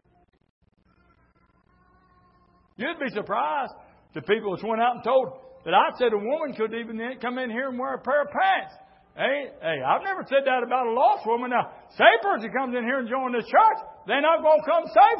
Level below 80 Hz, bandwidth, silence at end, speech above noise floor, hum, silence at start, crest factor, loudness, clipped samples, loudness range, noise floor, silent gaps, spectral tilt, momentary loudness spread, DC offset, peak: -68 dBFS; 5.8 kHz; 0 s; 39 dB; none; 2.8 s; 22 dB; -24 LUFS; under 0.1%; 10 LU; -63 dBFS; none; -8.5 dB/octave; 12 LU; under 0.1%; -2 dBFS